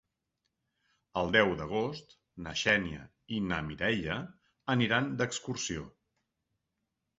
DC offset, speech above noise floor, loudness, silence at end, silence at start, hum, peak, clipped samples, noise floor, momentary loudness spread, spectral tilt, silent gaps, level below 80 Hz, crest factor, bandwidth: under 0.1%; 53 dB; -32 LUFS; 1.3 s; 1.15 s; none; -10 dBFS; under 0.1%; -84 dBFS; 16 LU; -3.5 dB/octave; none; -58 dBFS; 24 dB; 8 kHz